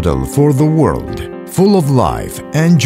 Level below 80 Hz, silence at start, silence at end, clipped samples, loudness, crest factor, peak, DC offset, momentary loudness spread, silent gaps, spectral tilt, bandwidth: -30 dBFS; 0 s; 0 s; under 0.1%; -13 LUFS; 12 dB; 0 dBFS; under 0.1%; 11 LU; none; -7 dB/octave; 16 kHz